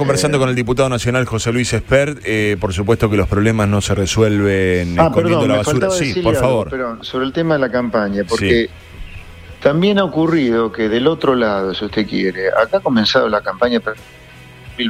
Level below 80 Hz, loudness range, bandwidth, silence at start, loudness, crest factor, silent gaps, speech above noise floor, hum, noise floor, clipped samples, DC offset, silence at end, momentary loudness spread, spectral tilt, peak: -36 dBFS; 2 LU; 16 kHz; 0 s; -16 LUFS; 16 dB; none; 23 dB; none; -39 dBFS; under 0.1%; under 0.1%; 0 s; 6 LU; -5.5 dB/octave; 0 dBFS